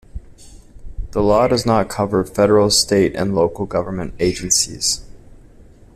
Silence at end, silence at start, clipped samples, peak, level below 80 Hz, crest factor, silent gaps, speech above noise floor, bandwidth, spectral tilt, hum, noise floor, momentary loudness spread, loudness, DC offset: 0.35 s; 0.15 s; under 0.1%; -2 dBFS; -36 dBFS; 16 dB; none; 27 dB; 15.5 kHz; -4 dB/octave; none; -44 dBFS; 9 LU; -17 LUFS; under 0.1%